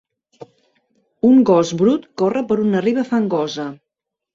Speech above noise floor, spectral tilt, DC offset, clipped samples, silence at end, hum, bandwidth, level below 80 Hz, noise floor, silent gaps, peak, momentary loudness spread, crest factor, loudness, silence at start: 66 dB; -6.5 dB/octave; under 0.1%; under 0.1%; 0.6 s; none; 7.6 kHz; -60 dBFS; -82 dBFS; none; -4 dBFS; 10 LU; 14 dB; -17 LUFS; 0.4 s